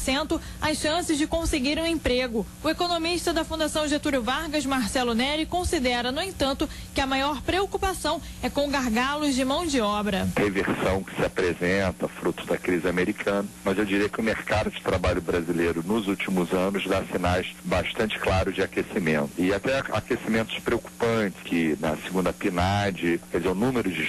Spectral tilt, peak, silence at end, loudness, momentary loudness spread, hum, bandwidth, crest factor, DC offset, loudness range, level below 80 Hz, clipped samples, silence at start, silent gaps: -4.5 dB/octave; -14 dBFS; 0 s; -26 LUFS; 4 LU; none; 12.5 kHz; 12 dB; under 0.1%; 1 LU; -42 dBFS; under 0.1%; 0 s; none